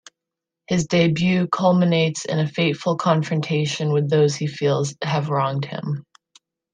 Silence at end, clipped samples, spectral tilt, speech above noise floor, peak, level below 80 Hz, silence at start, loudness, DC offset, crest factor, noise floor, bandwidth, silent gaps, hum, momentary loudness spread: 0.7 s; under 0.1%; -6 dB/octave; 65 dB; -4 dBFS; -58 dBFS; 0.7 s; -21 LUFS; under 0.1%; 16 dB; -85 dBFS; 9.6 kHz; none; none; 7 LU